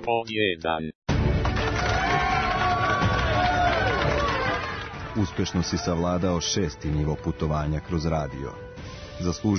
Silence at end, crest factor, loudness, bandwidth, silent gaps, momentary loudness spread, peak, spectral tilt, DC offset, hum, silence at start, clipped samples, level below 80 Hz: 0 s; 14 dB; -25 LUFS; 6.6 kHz; 0.95-1.02 s; 9 LU; -12 dBFS; -5 dB/octave; under 0.1%; none; 0 s; under 0.1%; -36 dBFS